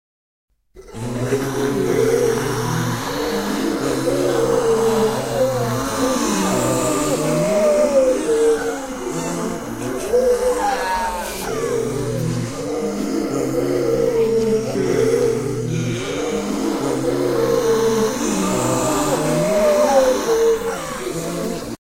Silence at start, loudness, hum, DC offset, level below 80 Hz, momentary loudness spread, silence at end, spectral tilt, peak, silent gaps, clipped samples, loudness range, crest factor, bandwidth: 0.75 s; -19 LUFS; none; 0.4%; -42 dBFS; 8 LU; 0.1 s; -5 dB/octave; -2 dBFS; none; under 0.1%; 3 LU; 16 dB; 16 kHz